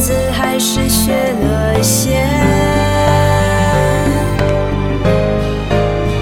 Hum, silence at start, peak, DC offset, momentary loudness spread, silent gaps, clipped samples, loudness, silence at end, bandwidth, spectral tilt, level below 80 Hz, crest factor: none; 0 s; 0 dBFS; under 0.1%; 3 LU; none; under 0.1%; -13 LUFS; 0 s; 18 kHz; -5 dB/octave; -22 dBFS; 12 dB